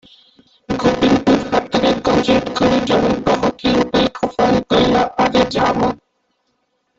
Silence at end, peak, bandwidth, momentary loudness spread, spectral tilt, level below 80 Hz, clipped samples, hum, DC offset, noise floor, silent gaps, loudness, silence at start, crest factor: 1.05 s; -2 dBFS; 8 kHz; 4 LU; -5.5 dB/octave; -40 dBFS; under 0.1%; none; under 0.1%; -67 dBFS; none; -16 LUFS; 0.7 s; 14 dB